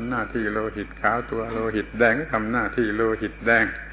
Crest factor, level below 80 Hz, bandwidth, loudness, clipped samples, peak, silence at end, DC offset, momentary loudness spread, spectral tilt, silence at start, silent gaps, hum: 18 dB; -42 dBFS; 4 kHz; -23 LUFS; under 0.1%; -6 dBFS; 0 s; under 0.1%; 7 LU; -10 dB/octave; 0 s; none; none